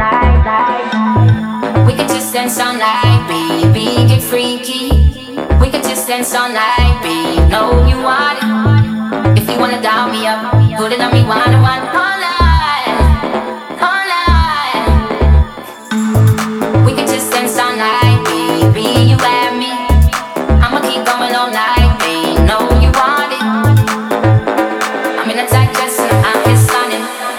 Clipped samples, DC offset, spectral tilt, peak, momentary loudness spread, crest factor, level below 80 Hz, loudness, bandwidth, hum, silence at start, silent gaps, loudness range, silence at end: under 0.1%; under 0.1%; -5.5 dB/octave; 0 dBFS; 5 LU; 10 dB; -18 dBFS; -12 LUFS; 16.5 kHz; none; 0 s; none; 1 LU; 0 s